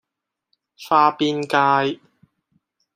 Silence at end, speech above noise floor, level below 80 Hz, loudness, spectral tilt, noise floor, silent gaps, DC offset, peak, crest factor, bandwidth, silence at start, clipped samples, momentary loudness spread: 1 s; 65 dB; -70 dBFS; -18 LUFS; -5 dB/octave; -83 dBFS; none; under 0.1%; -2 dBFS; 20 dB; 15.5 kHz; 0.8 s; under 0.1%; 15 LU